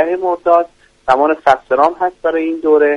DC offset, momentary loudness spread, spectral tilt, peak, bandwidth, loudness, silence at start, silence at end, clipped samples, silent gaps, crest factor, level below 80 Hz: under 0.1%; 5 LU; -5.5 dB/octave; 0 dBFS; 10 kHz; -14 LUFS; 0 s; 0 s; under 0.1%; none; 14 dB; -50 dBFS